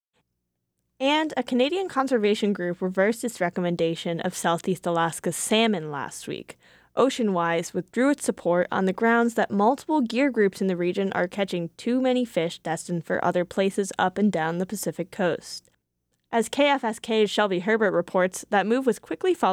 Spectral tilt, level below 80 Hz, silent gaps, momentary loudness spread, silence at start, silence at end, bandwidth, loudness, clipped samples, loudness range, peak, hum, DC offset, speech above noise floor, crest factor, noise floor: -5 dB/octave; -68 dBFS; none; 7 LU; 1 s; 0 s; 18.5 kHz; -25 LUFS; under 0.1%; 3 LU; -8 dBFS; none; under 0.1%; 55 dB; 16 dB; -79 dBFS